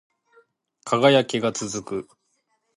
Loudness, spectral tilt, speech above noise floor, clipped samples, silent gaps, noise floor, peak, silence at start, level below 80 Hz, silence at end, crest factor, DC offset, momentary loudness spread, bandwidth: -22 LUFS; -4.5 dB/octave; 50 dB; under 0.1%; none; -71 dBFS; -2 dBFS; 0.85 s; -66 dBFS; 0.75 s; 22 dB; under 0.1%; 16 LU; 11.5 kHz